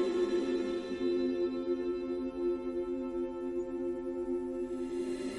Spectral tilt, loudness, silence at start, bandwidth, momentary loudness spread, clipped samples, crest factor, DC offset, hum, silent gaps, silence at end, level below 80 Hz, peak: -6 dB/octave; -35 LUFS; 0 s; 11 kHz; 5 LU; under 0.1%; 12 dB; under 0.1%; none; none; 0 s; -60 dBFS; -22 dBFS